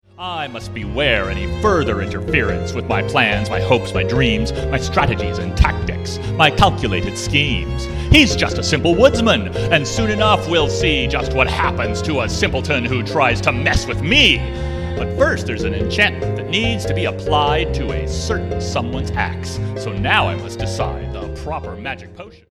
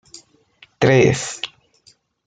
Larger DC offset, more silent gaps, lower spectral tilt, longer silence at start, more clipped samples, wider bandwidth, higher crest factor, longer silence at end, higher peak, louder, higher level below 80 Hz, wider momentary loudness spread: neither; neither; about the same, -5 dB/octave vs -5 dB/octave; second, 0.2 s vs 0.8 s; neither; first, 13.5 kHz vs 9.4 kHz; about the same, 18 dB vs 18 dB; second, 0.15 s vs 0.8 s; about the same, 0 dBFS vs -2 dBFS; about the same, -17 LUFS vs -17 LUFS; first, -28 dBFS vs -54 dBFS; second, 11 LU vs 16 LU